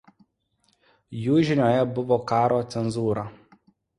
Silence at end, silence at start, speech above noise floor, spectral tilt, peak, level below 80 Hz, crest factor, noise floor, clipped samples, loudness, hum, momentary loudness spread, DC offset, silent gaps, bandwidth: 0.65 s; 1.1 s; 47 dB; -7.5 dB/octave; -8 dBFS; -58 dBFS; 18 dB; -70 dBFS; under 0.1%; -23 LUFS; none; 10 LU; under 0.1%; none; 11 kHz